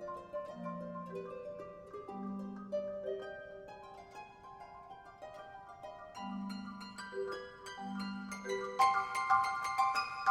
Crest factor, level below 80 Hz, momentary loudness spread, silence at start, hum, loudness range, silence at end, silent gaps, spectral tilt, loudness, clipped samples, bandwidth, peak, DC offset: 22 dB; -72 dBFS; 20 LU; 0 s; none; 13 LU; 0 s; none; -4.5 dB/octave; -38 LUFS; under 0.1%; 16 kHz; -16 dBFS; under 0.1%